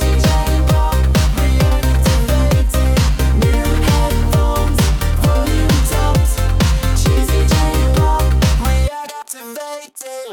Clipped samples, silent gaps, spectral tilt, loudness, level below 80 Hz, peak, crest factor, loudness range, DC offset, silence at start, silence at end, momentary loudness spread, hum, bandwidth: under 0.1%; none; -5.5 dB/octave; -15 LUFS; -16 dBFS; -4 dBFS; 10 dB; 1 LU; 0.1%; 0 s; 0 s; 12 LU; none; 18.5 kHz